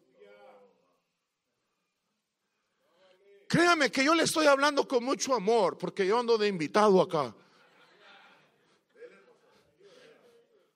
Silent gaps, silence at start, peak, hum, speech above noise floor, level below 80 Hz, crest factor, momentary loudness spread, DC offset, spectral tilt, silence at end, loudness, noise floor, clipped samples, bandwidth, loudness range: none; 3.5 s; -10 dBFS; none; 56 dB; -76 dBFS; 20 dB; 7 LU; under 0.1%; -4 dB/octave; 1.7 s; -26 LUFS; -82 dBFS; under 0.1%; 15.5 kHz; 7 LU